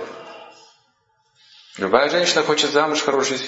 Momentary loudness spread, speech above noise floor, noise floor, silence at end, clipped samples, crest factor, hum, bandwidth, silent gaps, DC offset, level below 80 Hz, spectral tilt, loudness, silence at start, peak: 19 LU; 46 dB; -65 dBFS; 0 s; under 0.1%; 20 dB; none; 8 kHz; none; under 0.1%; -66 dBFS; -2.5 dB/octave; -18 LUFS; 0 s; -2 dBFS